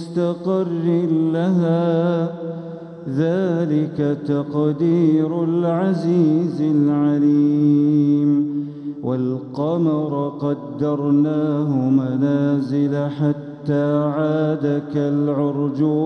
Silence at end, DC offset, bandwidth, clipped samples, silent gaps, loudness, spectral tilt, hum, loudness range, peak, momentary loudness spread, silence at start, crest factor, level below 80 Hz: 0 s; under 0.1%; 6.2 kHz; under 0.1%; none; -19 LUFS; -10 dB/octave; none; 4 LU; -6 dBFS; 8 LU; 0 s; 12 dB; -66 dBFS